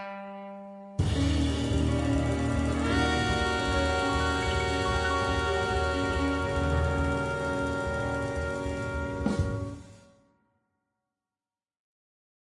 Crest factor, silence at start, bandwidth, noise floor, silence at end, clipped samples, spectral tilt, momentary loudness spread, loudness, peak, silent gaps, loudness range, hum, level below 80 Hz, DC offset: 16 dB; 0 s; 11.5 kHz; under -90 dBFS; 2.5 s; under 0.1%; -5.5 dB/octave; 7 LU; -28 LUFS; -14 dBFS; none; 8 LU; none; -38 dBFS; under 0.1%